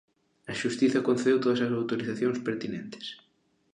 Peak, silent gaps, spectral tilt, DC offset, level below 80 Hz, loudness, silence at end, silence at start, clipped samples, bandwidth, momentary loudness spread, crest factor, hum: -12 dBFS; none; -5.5 dB/octave; under 0.1%; -72 dBFS; -28 LUFS; 0.6 s; 0.5 s; under 0.1%; 10 kHz; 16 LU; 16 dB; none